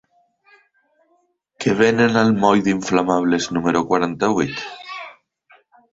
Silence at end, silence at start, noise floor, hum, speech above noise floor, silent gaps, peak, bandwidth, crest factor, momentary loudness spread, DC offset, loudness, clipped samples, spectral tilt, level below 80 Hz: 0.8 s; 1.6 s; -64 dBFS; none; 47 dB; none; -2 dBFS; 8 kHz; 18 dB; 16 LU; under 0.1%; -18 LUFS; under 0.1%; -5.5 dB/octave; -56 dBFS